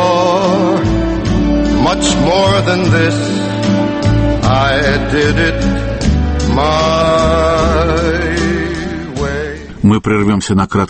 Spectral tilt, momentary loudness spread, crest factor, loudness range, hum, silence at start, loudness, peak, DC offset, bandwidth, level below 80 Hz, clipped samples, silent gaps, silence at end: -5.5 dB/octave; 5 LU; 12 dB; 2 LU; none; 0 s; -13 LUFS; 0 dBFS; under 0.1%; 8.8 kHz; -22 dBFS; under 0.1%; none; 0 s